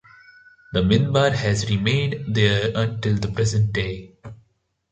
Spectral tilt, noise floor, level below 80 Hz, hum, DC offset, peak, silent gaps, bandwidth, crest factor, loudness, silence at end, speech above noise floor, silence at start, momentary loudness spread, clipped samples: -5.5 dB/octave; -66 dBFS; -42 dBFS; none; under 0.1%; -4 dBFS; none; 9 kHz; 18 dB; -21 LUFS; 0.55 s; 45 dB; 0.7 s; 8 LU; under 0.1%